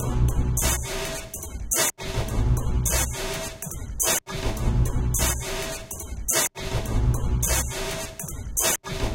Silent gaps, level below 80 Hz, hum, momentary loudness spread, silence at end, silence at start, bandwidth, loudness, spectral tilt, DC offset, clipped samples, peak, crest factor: none; -30 dBFS; none; 10 LU; 0 s; 0 s; 17 kHz; -25 LUFS; -3.5 dB/octave; under 0.1%; under 0.1%; -2 dBFS; 22 dB